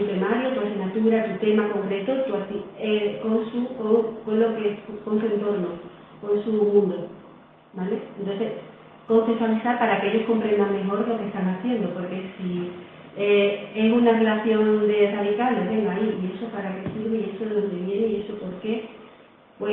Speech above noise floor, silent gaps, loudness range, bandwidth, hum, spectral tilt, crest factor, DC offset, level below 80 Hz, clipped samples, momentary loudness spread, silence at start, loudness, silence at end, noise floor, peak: 28 dB; none; 5 LU; 4.1 kHz; none; -10 dB/octave; 18 dB; under 0.1%; -64 dBFS; under 0.1%; 11 LU; 0 s; -24 LUFS; 0 s; -51 dBFS; -6 dBFS